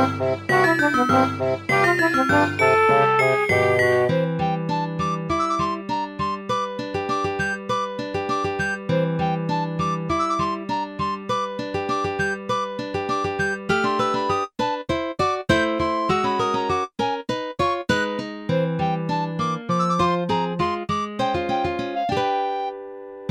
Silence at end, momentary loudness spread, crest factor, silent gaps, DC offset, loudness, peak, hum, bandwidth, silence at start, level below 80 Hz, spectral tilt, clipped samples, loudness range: 0 s; 9 LU; 18 dB; none; under 0.1%; -22 LUFS; -4 dBFS; none; 16 kHz; 0 s; -50 dBFS; -5.5 dB/octave; under 0.1%; 6 LU